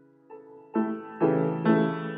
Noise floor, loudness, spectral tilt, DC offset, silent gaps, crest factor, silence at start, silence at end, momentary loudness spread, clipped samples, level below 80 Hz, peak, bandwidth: -49 dBFS; -26 LUFS; -11.5 dB/octave; under 0.1%; none; 18 dB; 0.3 s; 0 s; 8 LU; under 0.1%; -80 dBFS; -10 dBFS; 4.9 kHz